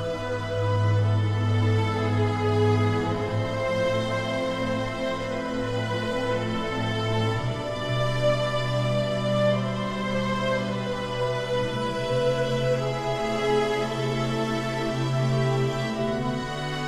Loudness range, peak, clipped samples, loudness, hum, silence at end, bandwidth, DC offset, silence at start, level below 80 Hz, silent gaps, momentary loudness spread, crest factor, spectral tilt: 3 LU; -12 dBFS; under 0.1%; -26 LUFS; none; 0 s; 12 kHz; under 0.1%; 0 s; -44 dBFS; none; 5 LU; 14 dB; -6.5 dB/octave